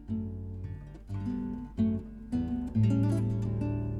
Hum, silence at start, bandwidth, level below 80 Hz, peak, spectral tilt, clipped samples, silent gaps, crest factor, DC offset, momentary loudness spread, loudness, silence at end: none; 0 s; 10.5 kHz; -46 dBFS; -16 dBFS; -9.5 dB/octave; under 0.1%; none; 14 dB; under 0.1%; 13 LU; -32 LUFS; 0 s